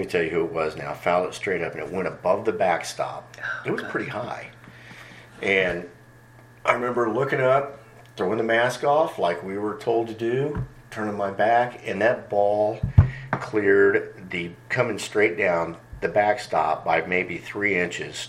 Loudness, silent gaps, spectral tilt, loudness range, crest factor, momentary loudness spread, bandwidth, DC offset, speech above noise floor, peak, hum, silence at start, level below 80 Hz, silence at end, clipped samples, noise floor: -24 LUFS; none; -6 dB/octave; 5 LU; 24 dB; 11 LU; 14.5 kHz; under 0.1%; 26 dB; 0 dBFS; none; 0 s; -44 dBFS; 0 s; under 0.1%; -49 dBFS